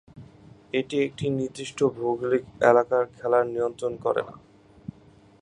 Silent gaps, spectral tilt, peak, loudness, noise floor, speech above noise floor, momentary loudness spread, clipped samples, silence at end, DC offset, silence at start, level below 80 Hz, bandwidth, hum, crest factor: none; -6 dB/octave; -4 dBFS; -25 LUFS; -54 dBFS; 29 dB; 18 LU; under 0.1%; 1.05 s; under 0.1%; 0.15 s; -62 dBFS; 10.5 kHz; none; 22 dB